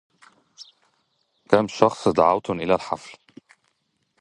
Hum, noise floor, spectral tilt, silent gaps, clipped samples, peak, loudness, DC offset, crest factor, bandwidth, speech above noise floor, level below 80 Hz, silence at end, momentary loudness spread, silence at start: none; -72 dBFS; -6 dB/octave; none; under 0.1%; 0 dBFS; -21 LUFS; under 0.1%; 24 dB; 11 kHz; 51 dB; -58 dBFS; 1.1 s; 13 LU; 0.6 s